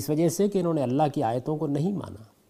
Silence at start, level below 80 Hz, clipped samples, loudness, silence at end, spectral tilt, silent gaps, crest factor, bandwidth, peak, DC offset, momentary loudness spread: 0 s; -64 dBFS; under 0.1%; -26 LUFS; 0.25 s; -7 dB/octave; none; 16 dB; 15.5 kHz; -10 dBFS; under 0.1%; 6 LU